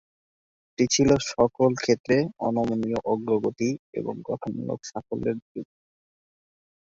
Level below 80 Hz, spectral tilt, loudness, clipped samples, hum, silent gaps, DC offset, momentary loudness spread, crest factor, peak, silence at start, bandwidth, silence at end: -54 dBFS; -5 dB/octave; -25 LUFS; under 0.1%; none; 2.00-2.04 s, 3.79-3.93 s, 5.42-5.55 s; under 0.1%; 12 LU; 20 dB; -6 dBFS; 0.8 s; 8 kHz; 1.3 s